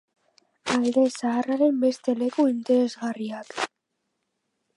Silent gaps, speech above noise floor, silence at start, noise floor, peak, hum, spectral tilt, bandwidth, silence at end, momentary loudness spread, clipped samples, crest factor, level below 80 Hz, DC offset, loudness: none; 55 dB; 0.65 s; -79 dBFS; -10 dBFS; none; -4.5 dB/octave; 11.5 kHz; 1.1 s; 11 LU; under 0.1%; 16 dB; -74 dBFS; under 0.1%; -24 LUFS